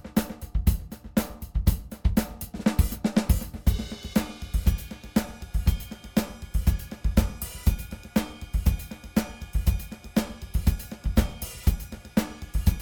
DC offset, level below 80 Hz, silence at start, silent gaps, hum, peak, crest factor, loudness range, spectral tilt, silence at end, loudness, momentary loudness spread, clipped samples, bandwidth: under 0.1%; -30 dBFS; 0.05 s; none; none; -6 dBFS; 20 dB; 2 LU; -6 dB/octave; 0 s; -29 LUFS; 7 LU; under 0.1%; over 20 kHz